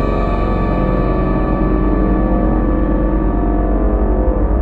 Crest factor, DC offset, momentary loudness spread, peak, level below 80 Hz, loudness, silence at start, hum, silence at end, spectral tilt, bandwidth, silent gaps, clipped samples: 12 dB; under 0.1%; 1 LU; -2 dBFS; -16 dBFS; -16 LUFS; 0 s; none; 0 s; -11 dB/octave; 4.3 kHz; none; under 0.1%